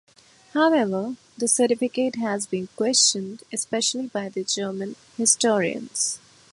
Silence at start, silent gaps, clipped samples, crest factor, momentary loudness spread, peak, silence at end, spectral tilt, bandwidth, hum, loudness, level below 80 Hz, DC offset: 0.55 s; none; under 0.1%; 20 dB; 12 LU; -4 dBFS; 0.35 s; -2.5 dB/octave; 11.5 kHz; none; -23 LUFS; -72 dBFS; under 0.1%